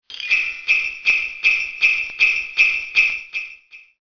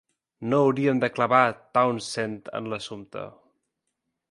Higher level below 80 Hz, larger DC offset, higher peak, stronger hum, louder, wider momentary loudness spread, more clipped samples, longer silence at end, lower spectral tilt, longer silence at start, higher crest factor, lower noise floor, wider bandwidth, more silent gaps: first, -54 dBFS vs -68 dBFS; first, 0.1% vs under 0.1%; about the same, -2 dBFS vs -4 dBFS; neither; first, -16 LUFS vs -24 LUFS; second, 7 LU vs 16 LU; neither; second, 0.2 s vs 1.05 s; second, 1.5 dB/octave vs -5.5 dB/octave; second, 0.1 s vs 0.4 s; about the same, 18 dB vs 22 dB; second, -44 dBFS vs -80 dBFS; second, 5.4 kHz vs 11.5 kHz; neither